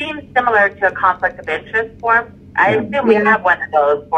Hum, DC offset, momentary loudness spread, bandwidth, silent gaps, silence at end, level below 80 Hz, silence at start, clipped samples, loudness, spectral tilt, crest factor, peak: none; under 0.1%; 7 LU; 8.6 kHz; none; 0 s; -50 dBFS; 0 s; under 0.1%; -15 LUFS; -6.5 dB/octave; 16 dB; 0 dBFS